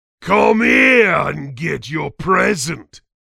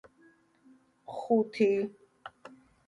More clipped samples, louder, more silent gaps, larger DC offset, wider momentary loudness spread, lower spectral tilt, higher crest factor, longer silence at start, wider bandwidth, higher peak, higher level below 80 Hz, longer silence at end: neither; first, -15 LUFS vs -29 LUFS; neither; neither; second, 14 LU vs 23 LU; second, -4.5 dB/octave vs -7 dB/octave; about the same, 16 dB vs 20 dB; second, 0.2 s vs 1.1 s; first, 15.5 kHz vs 11 kHz; first, 0 dBFS vs -14 dBFS; first, -46 dBFS vs -78 dBFS; second, 0.25 s vs 0.4 s